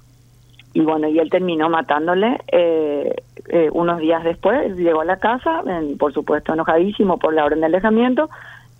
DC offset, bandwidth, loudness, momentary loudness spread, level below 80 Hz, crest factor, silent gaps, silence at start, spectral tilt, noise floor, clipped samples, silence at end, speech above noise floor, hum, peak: under 0.1%; 6.6 kHz; -18 LUFS; 5 LU; -50 dBFS; 16 dB; none; 0.75 s; -8 dB/octave; -49 dBFS; under 0.1%; 0.25 s; 32 dB; none; -2 dBFS